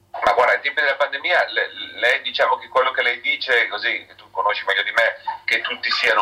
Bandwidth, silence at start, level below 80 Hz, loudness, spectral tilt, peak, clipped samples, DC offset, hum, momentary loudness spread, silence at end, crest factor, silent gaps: 16 kHz; 0.15 s; -62 dBFS; -19 LUFS; -1 dB/octave; -6 dBFS; under 0.1%; under 0.1%; none; 6 LU; 0 s; 14 dB; none